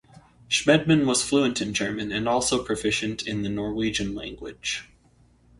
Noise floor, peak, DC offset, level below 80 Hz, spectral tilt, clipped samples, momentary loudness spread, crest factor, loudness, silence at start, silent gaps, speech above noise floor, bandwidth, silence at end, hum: -59 dBFS; -6 dBFS; under 0.1%; -50 dBFS; -4 dB/octave; under 0.1%; 11 LU; 20 dB; -24 LUFS; 0.15 s; none; 34 dB; 11.5 kHz; 0.75 s; none